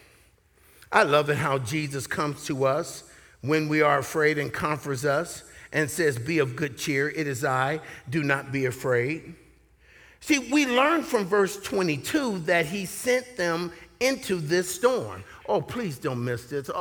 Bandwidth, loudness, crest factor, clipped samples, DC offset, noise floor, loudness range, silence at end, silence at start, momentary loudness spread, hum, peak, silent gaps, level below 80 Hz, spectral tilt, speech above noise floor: over 20 kHz; -26 LUFS; 22 dB; under 0.1%; under 0.1%; -60 dBFS; 3 LU; 0 s; 0.9 s; 9 LU; none; -4 dBFS; none; -60 dBFS; -4.5 dB/octave; 34 dB